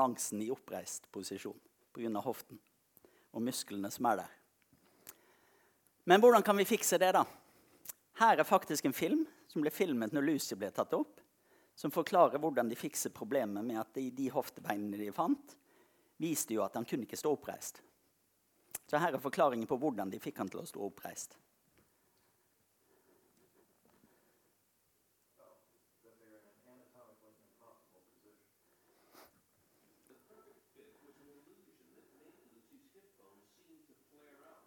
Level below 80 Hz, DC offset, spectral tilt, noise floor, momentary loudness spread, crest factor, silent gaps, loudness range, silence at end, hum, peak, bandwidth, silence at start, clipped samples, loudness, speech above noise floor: -86 dBFS; under 0.1%; -4 dB/octave; -76 dBFS; 18 LU; 28 dB; none; 12 LU; 13.4 s; none; -10 dBFS; 19 kHz; 0 s; under 0.1%; -34 LUFS; 42 dB